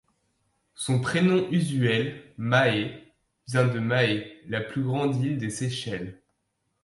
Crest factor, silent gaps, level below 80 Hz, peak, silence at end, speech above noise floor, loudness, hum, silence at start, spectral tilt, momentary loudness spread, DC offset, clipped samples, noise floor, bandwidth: 18 dB; none; -62 dBFS; -8 dBFS; 0.7 s; 51 dB; -26 LUFS; none; 0.8 s; -6 dB/octave; 11 LU; under 0.1%; under 0.1%; -76 dBFS; 11.5 kHz